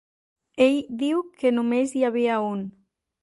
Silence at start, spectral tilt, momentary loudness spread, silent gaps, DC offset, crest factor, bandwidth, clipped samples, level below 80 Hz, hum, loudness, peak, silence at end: 0.55 s; -5.5 dB/octave; 11 LU; none; under 0.1%; 18 dB; 11.5 kHz; under 0.1%; -68 dBFS; none; -23 LUFS; -6 dBFS; 0.55 s